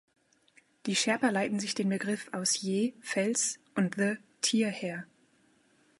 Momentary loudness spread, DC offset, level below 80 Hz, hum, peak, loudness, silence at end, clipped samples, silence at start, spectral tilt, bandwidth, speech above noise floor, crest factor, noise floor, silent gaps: 6 LU; under 0.1%; -82 dBFS; none; -14 dBFS; -30 LUFS; 0.95 s; under 0.1%; 0.85 s; -3.5 dB/octave; 11.5 kHz; 37 dB; 18 dB; -67 dBFS; none